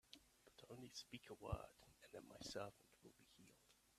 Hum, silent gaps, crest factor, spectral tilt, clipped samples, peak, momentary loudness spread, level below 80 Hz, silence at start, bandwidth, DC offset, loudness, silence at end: none; none; 26 dB; -4.5 dB/octave; under 0.1%; -32 dBFS; 17 LU; -68 dBFS; 0.05 s; 14.5 kHz; under 0.1%; -56 LUFS; 0 s